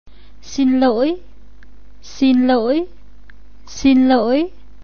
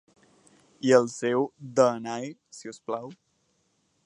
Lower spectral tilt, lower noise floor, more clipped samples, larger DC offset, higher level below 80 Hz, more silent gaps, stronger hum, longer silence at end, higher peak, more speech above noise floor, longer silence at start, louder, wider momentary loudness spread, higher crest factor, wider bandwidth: about the same, -5 dB/octave vs -5 dB/octave; second, -45 dBFS vs -71 dBFS; neither; first, 3% vs under 0.1%; first, -44 dBFS vs -78 dBFS; neither; neither; second, 0.35 s vs 0.95 s; about the same, -2 dBFS vs -4 dBFS; second, 30 dB vs 45 dB; second, 0.45 s vs 0.85 s; first, -16 LUFS vs -26 LUFS; second, 16 LU vs 20 LU; second, 16 dB vs 24 dB; second, 6.8 kHz vs 11 kHz